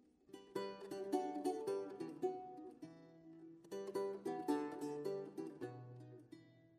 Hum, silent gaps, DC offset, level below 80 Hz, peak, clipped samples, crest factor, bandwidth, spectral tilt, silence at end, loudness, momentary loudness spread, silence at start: none; none; under 0.1%; -88 dBFS; -26 dBFS; under 0.1%; 20 dB; 15 kHz; -6 dB/octave; 0 s; -45 LUFS; 18 LU; 0.3 s